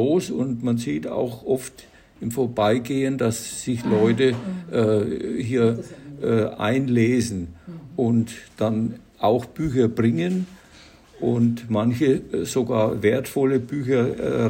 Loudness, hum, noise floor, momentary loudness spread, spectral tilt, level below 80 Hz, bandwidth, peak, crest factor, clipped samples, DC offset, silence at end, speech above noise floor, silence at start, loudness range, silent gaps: -23 LUFS; none; -49 dBFS; 9 LU; -6.5 dB/octave; -52 dBFS; 16.5 kHz; -6 dBFS; 16 dB; under 0.1%; under 0.1%; 0 s; 27 dB; 0 s; 2 LU; none